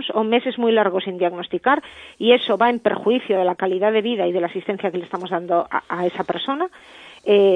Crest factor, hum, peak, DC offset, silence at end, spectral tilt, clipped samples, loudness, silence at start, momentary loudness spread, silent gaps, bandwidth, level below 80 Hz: 18 dB; none; -2 dBFS; under 0.1%; 0 s; -6.5 dB/octave; under 0.1%; -20 LUFS; 0 s; 8 LU; none; 9.2 kHz; -66 dBFS